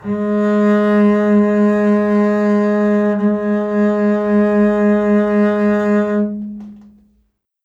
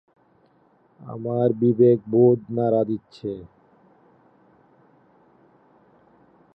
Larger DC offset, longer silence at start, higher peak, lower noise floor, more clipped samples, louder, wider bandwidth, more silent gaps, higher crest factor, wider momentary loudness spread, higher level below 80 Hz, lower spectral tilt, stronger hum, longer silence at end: neither; second, 0 s vs 1.05 s; about the same, -4 dBFS vs -6 dBFS; about the same, -62 dBFS vs -60 dBFS; neither; first, -14 LUFS vs -21 LUFS; first, 7.2 kHz vs 5.2 kHz; neither; second, 12 dB vs 18 dB; second, 5 LU vs 16 LU; first, -52 dBFS vs -66 dBFS; second, -9 dB/octave vs -11.5 dB/octave; neither; second, 0.85 s vs 3.1 s